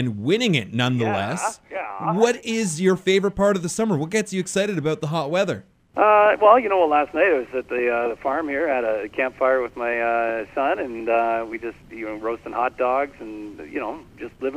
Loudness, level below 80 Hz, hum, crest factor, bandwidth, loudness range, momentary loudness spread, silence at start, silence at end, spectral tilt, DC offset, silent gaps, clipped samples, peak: -21 LUFS; -54 dBFS; none; 20 dB; 15.5 kHz; 6 LU; 14 LU; 0 s; 0 s; -5 dB/octave; under 0.1%; none; under 0.1%; -2 dBFS